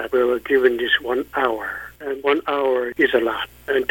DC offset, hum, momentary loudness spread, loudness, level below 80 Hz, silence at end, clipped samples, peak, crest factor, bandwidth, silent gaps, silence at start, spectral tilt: under 0.1%; none; 10 LU; -20 LUFS; -52 dBFS; 0.05 s; under 0.1%; -2 dBFS; 18 dB; 18 kHz; none; 0 s; -4.5 dB/octave